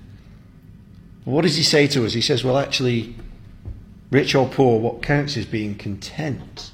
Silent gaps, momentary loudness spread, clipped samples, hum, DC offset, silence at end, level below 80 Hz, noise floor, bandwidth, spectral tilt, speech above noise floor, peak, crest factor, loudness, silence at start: none; 20 LU; under 0.1%; none; under 0.1%; 0.05 s; -44 dBFS; -45 dBFS; 16 kHz; -5 dB/octave; 25 dB; -4 dBFS; 18 dB; -20 LUFS; 0.1 s